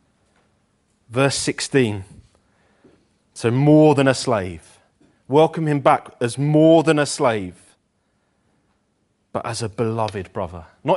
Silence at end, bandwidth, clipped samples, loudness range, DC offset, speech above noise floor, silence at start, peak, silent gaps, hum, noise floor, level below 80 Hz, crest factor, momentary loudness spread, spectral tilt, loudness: 0 s; 11.5 kHz; under 0.1%; 8 LU; under 0.1%; 49 dB; 1.1 s; 0 dBFS; none; none; -67 dBFS; -56 dBFS; 20 dB; 16 LU; -6 dB/octave; -19 LUFS